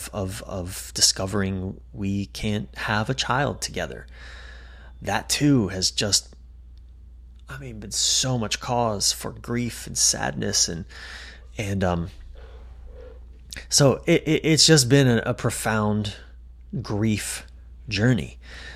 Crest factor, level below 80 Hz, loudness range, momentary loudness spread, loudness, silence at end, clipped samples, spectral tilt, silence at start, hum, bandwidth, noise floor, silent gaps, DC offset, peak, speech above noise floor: 22 dB; -42 dBFS; 8 LU; 20 LU; -22 LUFS; 0 s; under 0.1%; -3.5 dB/octave; 0 s; none; 16 kHz; -45 dBFS; none; under 0.1%; -2 dBFS; 21 dB